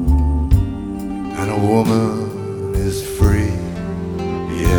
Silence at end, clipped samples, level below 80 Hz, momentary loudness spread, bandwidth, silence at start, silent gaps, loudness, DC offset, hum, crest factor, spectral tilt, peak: 0 s; under 0.1%; -22 dBFS; 9 LU; over 20 kHz; 0 s; none; -19 LUFS; 0.1%; none; 18 dB; -7 dB/octave; 0 dBFS